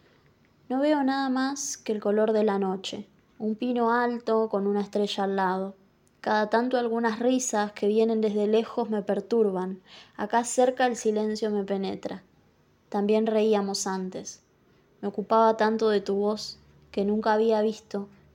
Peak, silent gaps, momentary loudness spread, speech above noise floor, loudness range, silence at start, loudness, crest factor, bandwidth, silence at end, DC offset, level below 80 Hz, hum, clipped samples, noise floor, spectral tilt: -8 dBFS; none; 13 LU; 37 dB; 3 LU; 0.7 s; -26 LUFS; 18 dB; 16.5 kHz; 0.25 s; under 0.1%; -70 dBFS; none; under 0.1%; -63 dBFS; -4.5 dB/octave